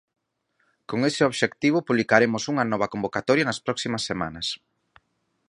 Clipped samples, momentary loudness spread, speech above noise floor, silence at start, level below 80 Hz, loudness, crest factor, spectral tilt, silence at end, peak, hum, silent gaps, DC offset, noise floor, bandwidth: under 0.1%; 9 LU; 49 dB; 0.9 s; -60 dBFS; -24 LUFS; 24 dB; -4.5 dB/octave; 0.95 s; -2 dBFS; none; none; under 0.1%; -72 dBFS; 11.5 kHz